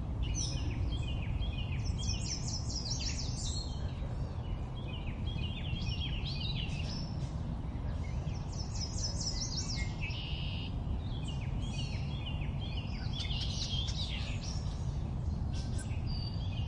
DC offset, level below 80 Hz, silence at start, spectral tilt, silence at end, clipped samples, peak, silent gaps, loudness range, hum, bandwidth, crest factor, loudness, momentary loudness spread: under 0.1%; -40 dBFS; 0 s; -4.5 dB/octave; 0 s; under 0.1%; -22 dBFS; none; 2 LU; none; 10.5 kHz; 14 dB; -37 LUFS; 4 LU